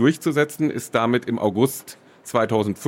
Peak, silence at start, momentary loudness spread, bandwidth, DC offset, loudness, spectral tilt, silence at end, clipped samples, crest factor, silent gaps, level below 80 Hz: -6 dBFS; 0 s; 10 LU; 16.5 kHz; under 0.1%; -22 LUFS; -5.5 dB/octave; 0 s; under 0.1%; 16 dB; none; -68 dBFS